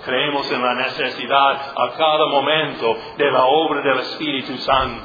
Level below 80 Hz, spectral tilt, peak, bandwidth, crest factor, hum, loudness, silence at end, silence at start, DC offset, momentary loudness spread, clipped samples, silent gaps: -48 dBFS; -5.5 dB/octave; 0 dBFS; 5 kHz; 18 dB; none; -18 LUFS; 0 s; 0 s; under 0.1%; 7 LU; under 0.1%; none